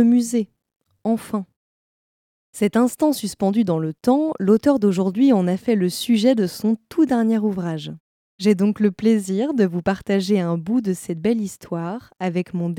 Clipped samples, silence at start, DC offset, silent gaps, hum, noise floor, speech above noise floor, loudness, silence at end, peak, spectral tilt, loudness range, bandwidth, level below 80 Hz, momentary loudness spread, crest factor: under 0.1%; 0 s; under 0.1%; 0.76-0.80 s, 1.56-2.53 s, 8.00-8.39 s; none; under -90 dBFS; over 71 dB; -20 LUFS; 0 s; -4 dBFS; -6.5 dB/octave; 4 LU; 16.5 kHz; -60 dBFS; 11 LU; 16 dB